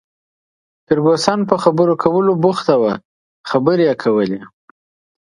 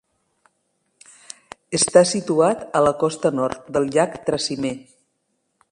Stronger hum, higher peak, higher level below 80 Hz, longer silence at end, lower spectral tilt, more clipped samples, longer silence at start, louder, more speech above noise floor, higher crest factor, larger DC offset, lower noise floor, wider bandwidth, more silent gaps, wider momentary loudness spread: neither; about the same, 0 dBFS vs 0 dBFS; about the same, -56 dBFS vs -58 dBFS; second, 0.75 s vs 0.95 s; first, -6.5 dB/octave vs -4 dB/octave; neither; second, 0.9 s vs 1.7 s; first, -15 LUFS vs -20 LUFS; first, over 76 dB vs 52 dB; second, 16 dB vs 22 dB; neither; first, under -90 dBFS vs -72 dBFS; about the same, 11.5 kHz vs 11.5 kHz; first, 3.05-3.44 s vs none; second, 7 LU vs 21 LU